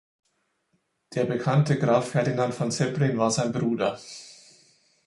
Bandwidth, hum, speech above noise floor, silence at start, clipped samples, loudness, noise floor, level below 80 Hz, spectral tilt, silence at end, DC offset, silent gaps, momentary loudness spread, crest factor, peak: 11.5 kHz; none; 49 dB; 1.1 s; under 0.1%; -25 LUFS; -73 dBFS; -64 dBFS; -6 dB/octave; 0.75 s; under 0.1%; none; 10 LU; 18 dB; -10 dBFS